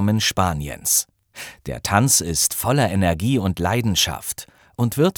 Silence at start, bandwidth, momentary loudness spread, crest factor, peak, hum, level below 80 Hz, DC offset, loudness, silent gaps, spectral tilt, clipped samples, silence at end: 0 s; over 20 kHz; 16 LU; 20 dB; -2 dBFS; none; -42 dBFS; under 0.1%; -19 LUFS; none; -3.5 dB/octave; under 0.1%; 0.05 s